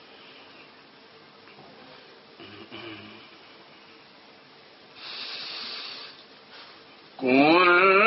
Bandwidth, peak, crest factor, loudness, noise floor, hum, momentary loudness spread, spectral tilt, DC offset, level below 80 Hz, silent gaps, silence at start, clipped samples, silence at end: 6 kHz; -6 dBFS; 22 dB; -22 LUFS; -52 dBFS; none; 30 LU; -1.5 dB/octave; under 0.1%; -76 dBFS; none; 2.6 s; under 0.1%; 0 s